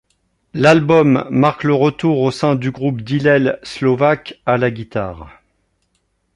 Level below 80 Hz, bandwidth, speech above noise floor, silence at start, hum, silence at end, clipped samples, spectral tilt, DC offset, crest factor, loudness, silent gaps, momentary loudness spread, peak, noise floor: -48 dBFS; 11 kHz; 51 dB; 0.55 s; none; 1.05 s; under 0.1%; -7 dB/octave; under 0.1%; 16 dB; -15 LUFS; none; 11 LU; 0 dBFS; -66 dBFS